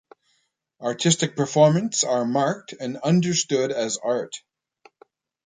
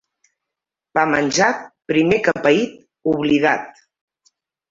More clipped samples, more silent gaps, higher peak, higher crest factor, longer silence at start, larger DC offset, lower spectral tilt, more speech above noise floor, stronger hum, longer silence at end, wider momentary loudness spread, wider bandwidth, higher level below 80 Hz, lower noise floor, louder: neither; neither; about the same, -4 dBFS vs -2 dBFS; about the same, 20 dB vs 18 dB; second, 0.8 s vs 0.95 s; neither; about the same, -4.5 dB/octave vs -4.5 dB/octave; second, 49 dB vs 68 dB; neither; about the same, 1.1 s vs 1 s; first, 13 LU vs 10 LU; first, 9.6 kHz vs 7.8 kHz; second, -68 dBFS vs -56 dBFS; second, -71 dBFS vs -85 dBFS; second, -22 LUFS vs -18 LUFS